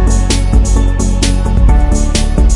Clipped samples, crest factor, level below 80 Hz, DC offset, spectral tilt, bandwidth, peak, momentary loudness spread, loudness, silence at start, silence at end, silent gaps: under 0.1%; 8 dB; -10 dBFS; under 0.1%; -5 dB/octave; 11.5 kHz; 0 dBFS; 2 LU; -12 LUFS; 0 s; 0 s; none